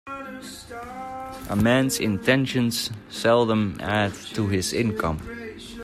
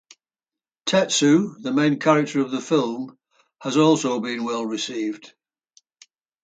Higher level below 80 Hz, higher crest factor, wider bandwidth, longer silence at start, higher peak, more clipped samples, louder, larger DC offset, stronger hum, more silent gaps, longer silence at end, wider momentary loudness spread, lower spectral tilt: first, -48 dBFS vs -72 dBFS; about the same, 18 dB vs 18 dB; first, 15.5 kHz vs 9.2 kHz; second, 0.05 s vs 0.85 s; about the same, -6 dBFS vs -4 dBFS; neither; about the same, -23 LUFS vs -21 LUFS; neither; neither; neither; second, 0 s vs 1.2 s; first, 16 LU vs 13 LU; about the same, -5 dB/octave vs -4.5 dB/octave